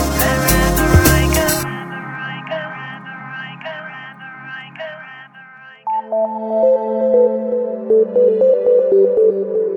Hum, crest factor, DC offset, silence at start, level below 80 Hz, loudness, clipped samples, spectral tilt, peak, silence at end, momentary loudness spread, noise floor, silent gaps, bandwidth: none; 16 dB; under 0.1%; 0 s; -28 dBFS; -15 LUFS; under 0.1%; -5 dB/octave; 0 dBFS; 0 s; 18 LU; -40 dBFS; none; 17.5 kHz